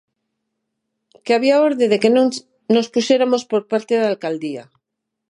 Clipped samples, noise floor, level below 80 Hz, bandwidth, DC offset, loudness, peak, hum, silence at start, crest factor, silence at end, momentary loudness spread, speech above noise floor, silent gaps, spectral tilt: under 0.1%; -79 dBFS; -74 dBFS; 11 kHz; under 0.1%; -17 LUFS; -2 dBFS; none; 1.25 s; 18 dB; 0.7 s; 13 LU; 62 dB; none; -4.5 dB/octave